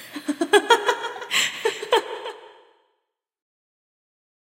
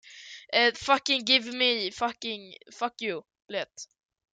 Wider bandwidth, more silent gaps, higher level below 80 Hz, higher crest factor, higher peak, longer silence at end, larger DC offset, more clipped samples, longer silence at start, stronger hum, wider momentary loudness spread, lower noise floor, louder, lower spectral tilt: first, 16 kHz vs 9.4 kHz; neither; second, -82 dBFS vs -70 dBFS; about the same, 22 dB vs 24 dB; about the same, -2 dBFS vs -4 dBFS; first, 2 s vs 0.5 s; neither; neither; about the same, 0 s vs 0.05 s; neither; second, 16 LU vs 22 LU; first, -77 dBFS vs -47 dBFS; first, -21 LUFS vs -26 LUFS; about the same, -0.5 dB/octave vs -1.5 dB/octave